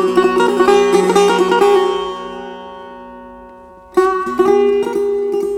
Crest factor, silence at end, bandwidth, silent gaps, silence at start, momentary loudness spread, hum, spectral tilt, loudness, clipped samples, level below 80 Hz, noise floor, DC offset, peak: 12 dB; 0 s; 13.5 kHz; none; 0 s; 20 LU; none; -4.5 dB/octave; -13 LUFS; under 0.1%; -48 dBFS; -38 dBFS; under 0.1%; -2 dBFS